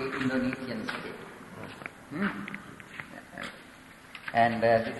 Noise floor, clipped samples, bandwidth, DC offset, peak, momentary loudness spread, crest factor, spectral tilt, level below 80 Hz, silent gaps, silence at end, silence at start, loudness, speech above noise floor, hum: -51 dBFS; under 0.1%; 12 kHz; under 0.1%; -10 dBFS; 19 LU; 22 dB; -6 dB/octave; -62 dBFS; none; 0 s; 0 s; -31 LUFS; 22 dB; none